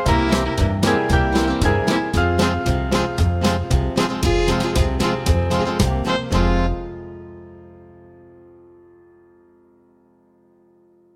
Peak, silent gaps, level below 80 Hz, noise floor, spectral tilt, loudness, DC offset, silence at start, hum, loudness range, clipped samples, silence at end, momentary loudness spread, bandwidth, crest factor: -4 dBFS; none; -26 dBFS; -56 dBFS; -5.5 dB/octave; -19 LUFS; under 0.1%; 0 s; none; 7 LU; under 0.1%; 3.4 s; 6 LU; 16 kHz; 16 dB